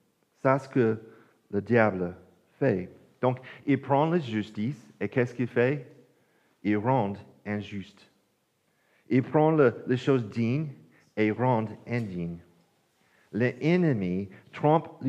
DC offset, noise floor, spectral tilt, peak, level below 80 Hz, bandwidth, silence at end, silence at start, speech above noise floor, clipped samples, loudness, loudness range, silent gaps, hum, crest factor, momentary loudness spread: under 0.1%; -72 dBFS; -8.5 dB/octave; -8 dBFS; -76 dBFS; 8.4 kHz; 0 s; 0.45 s; 45 dB; under 0.1%; -28 LUFS; 4 LU; none; none; 20 dB; 12 LU